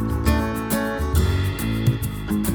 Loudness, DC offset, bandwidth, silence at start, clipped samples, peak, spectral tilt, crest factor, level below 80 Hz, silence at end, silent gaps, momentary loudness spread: -23 LUFS; under 0.1%; over 20 kHz; 0 s; under 0.1%; -4 dBFS; -6 dB/octave; 16 dB; -28 dBFS; 0 s; none; 3 LU